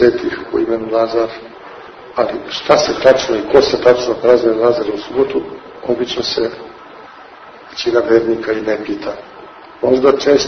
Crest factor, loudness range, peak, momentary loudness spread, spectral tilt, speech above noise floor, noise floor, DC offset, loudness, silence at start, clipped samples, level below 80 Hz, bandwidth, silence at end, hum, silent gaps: 16 dB; 6 LU; 0 dBFS; 21 LU; -4.5 dB/octave; 23 dB; -37 dBFS; under 0.1%; -15 LUFS; 0 s; 0.2%; -48 dBFS; 6.6 kHz; 0 s; none; none